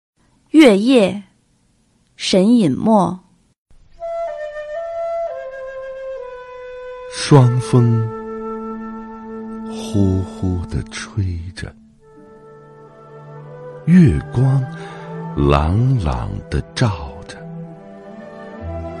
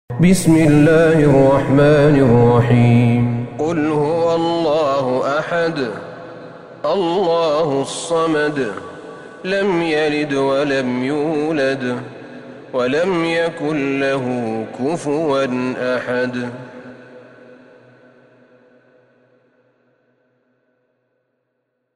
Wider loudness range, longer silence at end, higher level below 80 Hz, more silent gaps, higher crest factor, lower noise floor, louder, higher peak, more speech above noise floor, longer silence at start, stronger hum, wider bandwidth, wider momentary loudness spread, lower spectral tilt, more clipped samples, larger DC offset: about the same, 10 LU vs 9 LU; second, 0 s vs 4.75 s; first, -34 dBFS vs -44 dBFS; first, 3.58-3.66 s vs none; about the same, 18 dB vs 16 dB; second, -59 dBFS vs -71 dBFS; about the same, -17 LUFS vs -16 LUFS; about the same, 0 dBFS vs 0 dBFS; second, 44 dB vs 56 dB; first, 0.55 s vs 0.1 s; neither; second, 11.5 kHz vs 15 kHz; first, 22 LU vs 18 LU; about the same, -7 dB/octave vs -6.5 dB/octave; neither; neither